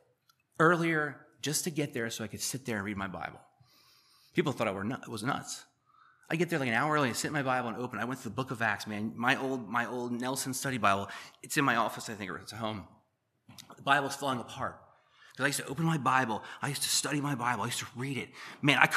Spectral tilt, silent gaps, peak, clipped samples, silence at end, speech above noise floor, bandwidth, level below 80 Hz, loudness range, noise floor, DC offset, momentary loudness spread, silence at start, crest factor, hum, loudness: -4 dB/octave; none; -6 dBFS; under 0.1%; 0 s; 42 dB; 15 kHz; -72 dBFS; 5 LU; -74 dBFS; under 0.1%; 11 LU; 0.6 s; 28 dB; none; -32 LUFS